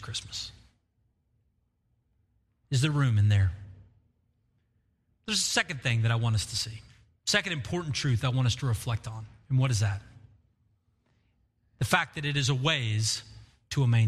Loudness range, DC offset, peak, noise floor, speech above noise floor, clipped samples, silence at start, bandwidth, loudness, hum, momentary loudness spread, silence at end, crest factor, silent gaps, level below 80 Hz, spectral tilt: 3 LU; under 0.1%; -8 dBFS; -73 dBFS; 46 dB; under 0.1%; 0 s; 14.5 kHz; -28 LUFS; none; 12 LU; 0 s; 22 dB; none; -54 dBFS; -4 dB/octave